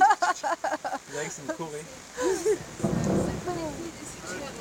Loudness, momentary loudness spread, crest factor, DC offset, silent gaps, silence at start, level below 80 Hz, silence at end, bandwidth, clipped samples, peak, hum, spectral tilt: -30 LUFS; 11 LU; 20 dB; under 0.1%; none; 0 s; -52 dBFS; 0 s; 17 kHz; under 0.1%; -8 dBFS; none; -4.5 dB/octave